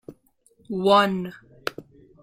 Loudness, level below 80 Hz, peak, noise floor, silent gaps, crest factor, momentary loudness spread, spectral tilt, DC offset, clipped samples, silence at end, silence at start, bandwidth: -23 LUFS; -62 dBFS; -6 dBFS; -62 dBFS; none; 20 dB; 16 LU; -5.5 dB/octave; under 0.1%; under 0.1%; 0.4 s; 0.1 s; 16.5 kHz